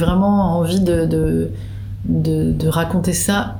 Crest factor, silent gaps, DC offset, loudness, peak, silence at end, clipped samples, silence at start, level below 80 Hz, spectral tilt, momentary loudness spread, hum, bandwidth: 14 dB; none; under 0.1%; -18 LUFS; -2 dBFS; 0 s; under 0.1%; 0 s; -32 dBFS; -6 dB/octave; 10 LU; none; over 20 kHz